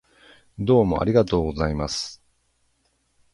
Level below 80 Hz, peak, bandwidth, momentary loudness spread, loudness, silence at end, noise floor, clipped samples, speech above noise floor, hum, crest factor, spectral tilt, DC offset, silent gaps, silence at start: -40 dBFS; -4 dBFS; 11.5 kHz; 10 LU; -22 LUFS; 1.2 s; -68 dBFS; under 0.1%; 47 dB; none; 20 dB; -6.5 dB/octave; under 0.1%; none; 0.6 s